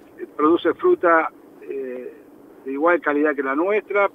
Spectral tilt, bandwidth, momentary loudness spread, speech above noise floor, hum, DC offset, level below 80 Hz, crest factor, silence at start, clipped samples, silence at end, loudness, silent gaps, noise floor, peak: -7 dB/octave; 3.9 kHz; 17 LU; 26 dB; none; under 0.1%; -72 dBFS; 18 dB; 0.2 s; under 0.1%; 0.05 s; -20 LUFS; none; -46 dBFS; -4 dBFS